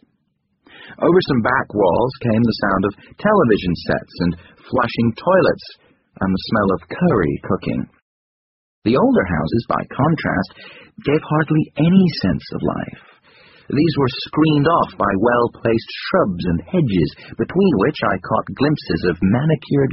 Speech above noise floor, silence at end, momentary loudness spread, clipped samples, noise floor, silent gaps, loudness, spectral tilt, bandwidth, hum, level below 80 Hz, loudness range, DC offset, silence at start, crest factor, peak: 50 dB; 0 s; 8 LU; under 0.1%; -68 dBFS; 8.02-8.82 s; -18 LUFS; -6 dB/octave; 5.8 kHz; none; -44 dBFS; 2 LU; under 0.1%; 0.8 s; 18 dB; 0 dBFS